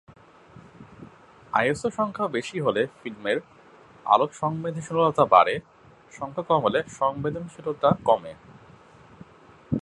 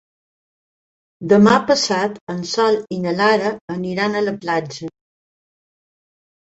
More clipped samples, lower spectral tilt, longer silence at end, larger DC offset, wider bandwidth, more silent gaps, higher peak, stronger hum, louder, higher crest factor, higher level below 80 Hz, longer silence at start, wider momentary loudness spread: neither; about the same, -6 dB/octave vs -5 dB/octave; second, 0 s vs 1.6 s; neither; first, 11.5 kHz vs 8 kHz; second, none vs 2.21-2.27 s, 3.61-3.68 s; about the same, -2 dBFS vs -2 dBFS; neither; second, -24 LUFS vs -18 LUFS; first, 24 dB vs 18 dB; about the same, -58 dBFS vs -60 dBFS; second, 0.55 s vs 1.2 s; about the same, 14 LU vs 15 LU